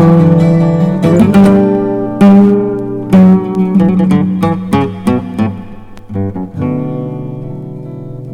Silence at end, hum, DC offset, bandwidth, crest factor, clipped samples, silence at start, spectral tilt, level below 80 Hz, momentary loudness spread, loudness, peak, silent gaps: 0 s; none; under 0.1%; 10.5 kHz; 10 dB; under 0.1%; 0 s; -9 dB/octave; -38 dBFS; 17 LU; -10 LUFS; 0 dBFS; none